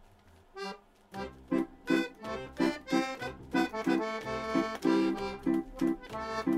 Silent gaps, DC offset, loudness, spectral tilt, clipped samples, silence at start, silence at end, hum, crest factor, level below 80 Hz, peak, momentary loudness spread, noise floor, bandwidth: none; under 0.1%; -33 LUFS; -5.5 dB/octave; under 0.1%; 0.55 s; 0 s; none; 18 dB; -56 dBFS; -16 dBFS; 14 LU; -59 dBFS; 14.5 kHz